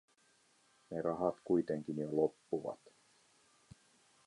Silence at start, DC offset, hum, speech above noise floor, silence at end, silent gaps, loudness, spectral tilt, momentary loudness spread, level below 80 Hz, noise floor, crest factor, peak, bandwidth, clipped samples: 0.9 s; under 0.1%; none; 35 dB; 1.5 s; none; -38 LUFS; -8 dB/octave; 11 LU; -74 dBFS; -72 dBFS; 22 dB; -18 dBFS; 11.5 kHz; under 0.1%